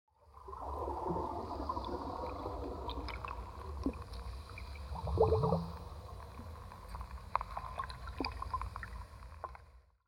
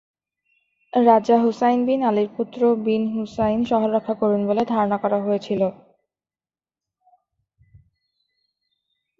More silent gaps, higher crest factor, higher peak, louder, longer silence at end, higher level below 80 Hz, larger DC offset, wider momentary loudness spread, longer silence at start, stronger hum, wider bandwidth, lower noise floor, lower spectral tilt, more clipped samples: neither; first, 26 dB vs 20 dB; second, -14 dBFS vs -2 dBFS; second, -41 LUFS vs -20 LUFS; second, 0.25 s vs 3.45 s; first, -48 dBFS vs -58 dBFS; neither; first, 15 LU vs 7 LU; second, 0.2 s vs 0.95 s; neither; first, 16.5 kHz vs 7.4 kHz; second, -61 dBFS vs under -90 dBFS; about the same, -7.5 dB/octave vs -7.5 dB/octave; neither